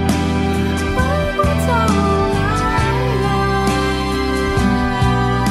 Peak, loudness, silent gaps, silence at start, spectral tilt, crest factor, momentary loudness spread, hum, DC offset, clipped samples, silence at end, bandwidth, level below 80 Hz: -4 dBFS; -17 LUFS; none; 0 s; -6 dB/octave; 12 dB; 3 LU; none; under 0.1%; under 0.1%; 0 s; 15.5 kHz; -26 dBFS